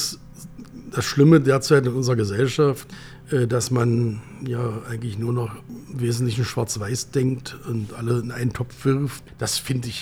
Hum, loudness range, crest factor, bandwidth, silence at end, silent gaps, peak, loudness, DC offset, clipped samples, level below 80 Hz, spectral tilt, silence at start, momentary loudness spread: none; 6 LU; 18 dB; 16.5 kHz; 0 s; none; -4 dBFS; -23 LUFS; under 0.1%; under 0.1%; -50 dBFS; -5.5 dB/octave; 0 s; 15 LU